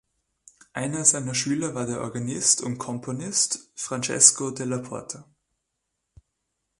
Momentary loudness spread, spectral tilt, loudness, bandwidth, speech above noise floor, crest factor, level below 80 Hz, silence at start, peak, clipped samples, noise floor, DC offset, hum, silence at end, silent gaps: 17 LU; -2.5 dB/octave; -23 LUFS; 11.5 kHz; 55 dB; 26 dB; -64 dBFS; 0.75 s; 0 dBFS; under 0.1%; -80 dBFS; under 0.1%; none; 1.6 s; none